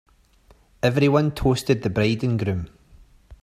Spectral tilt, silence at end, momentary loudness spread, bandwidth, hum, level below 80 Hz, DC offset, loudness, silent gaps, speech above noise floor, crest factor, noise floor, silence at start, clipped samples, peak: -7 dB/octave; 0.1 s; 8 LU; 15 kHz; none; -42 dBFS; under 0.1%; -22 LUFS; none; 35 dB; 18 dB; -56 dBFS; 0.85 s; under 0.1%; -4 dBFS